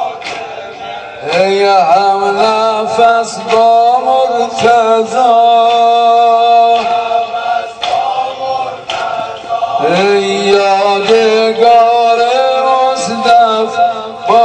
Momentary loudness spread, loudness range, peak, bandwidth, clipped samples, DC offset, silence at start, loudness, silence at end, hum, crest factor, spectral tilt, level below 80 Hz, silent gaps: 11 LU; 5 LU; 0 dBFS; 9.4 kHz; 0.3%; under 0.1%; 0 s; -10 LUFS; 0 s; none; 10 dB; -3.5 dB/octave; -54 dBFS; none